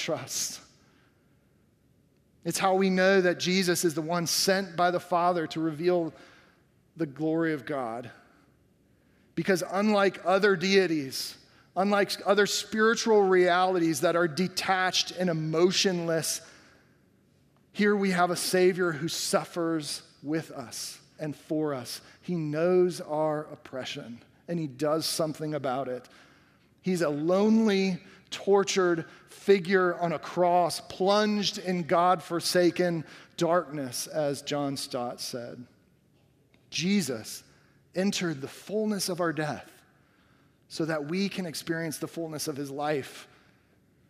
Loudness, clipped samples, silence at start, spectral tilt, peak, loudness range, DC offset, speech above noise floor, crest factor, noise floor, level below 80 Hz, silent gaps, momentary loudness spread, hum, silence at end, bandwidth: -27 LUFS; under 0.1%; 0 s; -4.5 dB/octave; -8 dBFS; 8 LU; under 0.1%; 38 dB; 20 dB; -65 dBFS; -72 dBFS; none; 14 LU; none; 0.85 s; 15.5 kHz